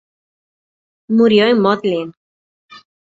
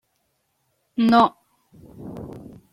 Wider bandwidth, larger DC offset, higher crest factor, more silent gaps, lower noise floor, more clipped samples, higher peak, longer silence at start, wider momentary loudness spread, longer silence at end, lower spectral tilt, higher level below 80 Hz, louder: second, 7.6 kHz vs 10.5 kHz; neither; about the same, 16 dB vs 20 dB; first, 2.17-2.69 s vs none; first, under -90 dBFS vs -71 dBFS; neither; about the same, -2 dBFS vs -4 dBFS; about the same, 1.1 s vs 1 s; second, 11 LU vs 24 LU; about the same, 0.4 s vs 0.35 s; about the same, -7 dB/octave vs -6.5 dB/octave; about the same, -60 dBFS vs -58 dBFS; first, -14 LUFS vs -19 LUFS